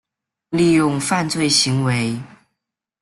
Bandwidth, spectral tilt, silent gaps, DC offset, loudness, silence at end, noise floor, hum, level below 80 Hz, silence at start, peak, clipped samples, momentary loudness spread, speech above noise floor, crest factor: 12.5 kHz; -4 dB/octave; none; under 0.1%; -17 LUFS; 0.75 s; -80 dBFS; none; -54 dBFS; 0.5 s; -2 dBFS; under 0.1%; 10 LU; 63 dB; 18 dB